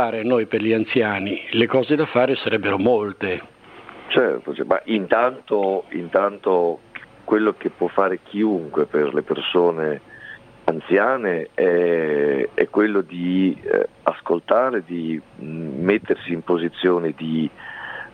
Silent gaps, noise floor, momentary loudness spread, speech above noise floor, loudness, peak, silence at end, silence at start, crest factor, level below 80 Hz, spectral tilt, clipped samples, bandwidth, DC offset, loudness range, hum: none; -42 dBFS; 10 LU; 22 dB; -21 LUFS; 0 dBFS; 0.05 s; 0 s; 20 dB; -64 dBFS; -8 dB/octave; under 0.1%; 5.2 kHz; under 0.1%; 2 LU; none